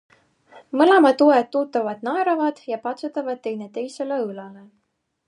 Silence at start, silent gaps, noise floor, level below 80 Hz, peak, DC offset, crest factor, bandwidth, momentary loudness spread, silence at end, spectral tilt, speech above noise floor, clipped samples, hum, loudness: 0.55 s; none; -73 dBFS; -80 dBFS; -2 dBFS; under 0.1%; 18 dB; 10.5 kHz; 15 LU; 0.7 s; -5.5 dB/octave; 53 dB; under 0.1%; none; -21 LUFS